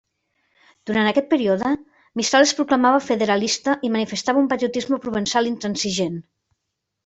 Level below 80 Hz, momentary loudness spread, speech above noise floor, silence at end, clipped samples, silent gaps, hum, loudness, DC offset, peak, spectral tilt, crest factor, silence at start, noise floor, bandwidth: -60 dBFS; 8 LU; 59 dB; 0.85 s; under 0.1%; none; none; -20 LUFS; under 0.1%; -4 dBFS; -3.5 dB/octave; 18 dB; 0.85 s; -79 dBFS; 8.4 kHz